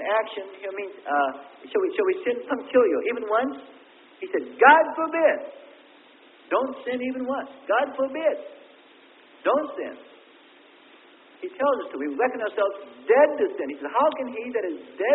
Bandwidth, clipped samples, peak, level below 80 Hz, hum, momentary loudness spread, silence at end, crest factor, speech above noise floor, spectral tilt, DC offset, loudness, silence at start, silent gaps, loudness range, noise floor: 4.1 kHz; under 0.1%; -4 dBFS; -76 dBFS; none; 15 LU; 0 s; 22 dB; 29 dB; -8 dB/octave; under 0.1%; -24 LUFS; 0 s; none; 8 LU; -53 dBFS